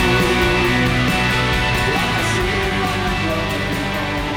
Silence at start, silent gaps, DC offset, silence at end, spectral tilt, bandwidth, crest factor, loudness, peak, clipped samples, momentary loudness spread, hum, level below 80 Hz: 0 s; none; under 0.1%; 0 s; -4.5 dB/octave; 19.5 kHz; 12 dB; -17 LUFS; -6 dBFS; under 0.1%; 5 LU; none; -28 dBFS